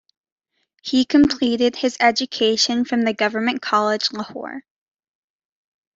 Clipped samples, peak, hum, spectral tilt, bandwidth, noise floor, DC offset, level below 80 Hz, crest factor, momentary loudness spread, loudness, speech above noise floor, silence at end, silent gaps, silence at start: under 0.1%; -2 dBFS; none; -3 dB/octave; 7.8 kHz; -63 dBFS; under 0.1%; -54 dBFS; 18 dB; 14 LU; -19 LUFS; 44 dB; 1.35 s; none; 0.85 s